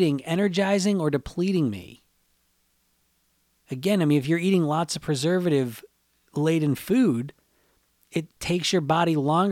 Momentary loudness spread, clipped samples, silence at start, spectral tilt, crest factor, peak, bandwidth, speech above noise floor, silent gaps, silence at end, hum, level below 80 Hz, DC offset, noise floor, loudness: 10 LU; under 0.1%; 0 s; -6 dB/octave; 16 dB; -8 dBFS; 16.5 kHz; 45 dB; none; 0 s; none; -58 dBFS; under 0.1%; -68 dBFS; -24 LUFS